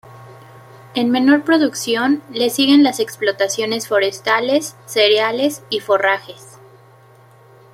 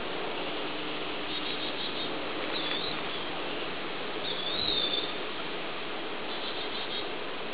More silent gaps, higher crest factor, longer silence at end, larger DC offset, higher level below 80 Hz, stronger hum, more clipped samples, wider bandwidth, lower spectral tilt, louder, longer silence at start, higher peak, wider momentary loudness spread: neither; about the same, 16 dB vs 18 dB; first, 1.3 s vs 0 s; second, under 0.1% vs 1%; about the same, -66 dBFS vs -62 dBFS; neither; neither; first, 15.5 kHz vs 4 kHz; first, -3 dB/octave vs -0.5 dB/octave; first, -16 LUFS vs -31 LUFS; about the same, 0.05 s vs 0 s; first, -2 dBFS vs -14 dBFS; about the same, 8 LU vs 8 LU